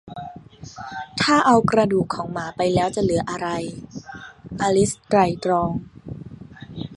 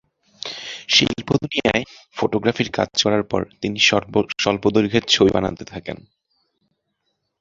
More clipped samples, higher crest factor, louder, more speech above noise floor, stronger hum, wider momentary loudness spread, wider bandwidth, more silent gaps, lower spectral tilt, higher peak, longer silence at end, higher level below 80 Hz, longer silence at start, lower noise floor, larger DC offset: neither; about the same, 20 dB vs 20 dB; about the same, -21 LUFS vs -19 LUFS; second, 20 dB vs 54 dB; neither; first, 22 LU vs 16 LU; first, 11.5 kHz vs 7.8 kHz; neither; about the same, -5 dB/octave vs -4 dB/octave; about the same, -2 dBFS vs -2 dBFS; second, 0 s vs 1.45 s; about the same, -48 dBFS vs -48 dBFS; second, 0.05 s vs 0.45 s; second, -41 dBFS vs -74 dBFS; neither